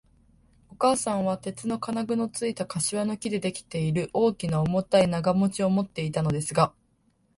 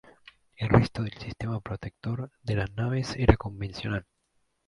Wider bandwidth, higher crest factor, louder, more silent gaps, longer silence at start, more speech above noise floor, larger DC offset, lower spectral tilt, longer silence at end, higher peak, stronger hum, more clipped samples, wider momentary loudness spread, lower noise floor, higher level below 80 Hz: about the same, 11.5 kHz vs 11 kHz; second, 20 dB vs 28 dB; first, -26 LUFS vs -29 LUFS; neither; about the same, 0.7 s vs 0.6 s; second, 41 dB vs 46 dB; neither; second, -5.5 dB/octave vs -7.5 dB/octave; about the same, 0.7 s vs 0.65 s; second, -6 dBFS vs -2 dBFS; neither; neither; second, 7 LU vs 12 LU; second, -67 dBFS vs -73 dBFS; second, -56 dBFS vs -40 dBFS